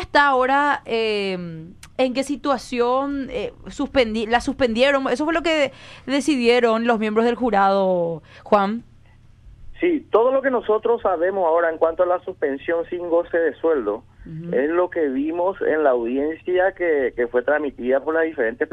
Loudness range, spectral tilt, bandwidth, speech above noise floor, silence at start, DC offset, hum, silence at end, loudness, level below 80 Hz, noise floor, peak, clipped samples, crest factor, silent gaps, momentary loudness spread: 3 LU; -5 dB/octave; 11.5 kHz; 28 dB; 0 s; under 0.1%; none; 0.05 s; -20 LUFS; -48 dBFS; -49 dBFS; -4 dBFS; under 0.1%; 16 dB; none; 9 LU